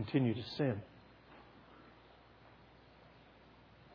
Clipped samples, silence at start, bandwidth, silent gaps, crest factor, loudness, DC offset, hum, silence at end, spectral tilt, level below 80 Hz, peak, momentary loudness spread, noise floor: under 0.1%; 0 s; 5.4 kHz; none; 22 dB; -37 LUFS; under 0.1%; none; 0 s; -6.5 dB/octave; -70 dBFS; -20 dBFS; 25 LU; -62 dBFS